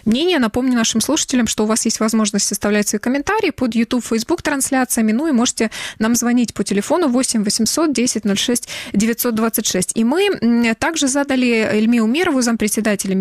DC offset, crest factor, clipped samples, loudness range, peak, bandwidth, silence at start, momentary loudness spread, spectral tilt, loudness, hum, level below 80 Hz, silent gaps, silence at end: under 0.1%; 12 dB; under 0.1%; 1 LU; -4 dBFS; 15 kHz; 0.05 s; 3 LU; -3.5 dB/octave; -17 LUFS; none; -48 dBFS; none; 0 s